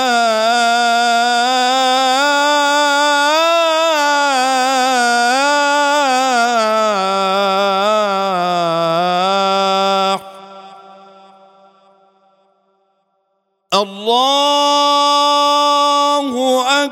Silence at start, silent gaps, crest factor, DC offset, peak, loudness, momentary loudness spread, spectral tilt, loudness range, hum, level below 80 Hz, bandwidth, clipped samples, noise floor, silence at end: 0 s; none; 14 dB; under 0.1%; 0 dBFS; -13 LUFS; 4 LU; -2 dB/octave; 7 LU; none; -76 dBFS; 17 kHz; under 0.1%; -67 dBFS; 0 s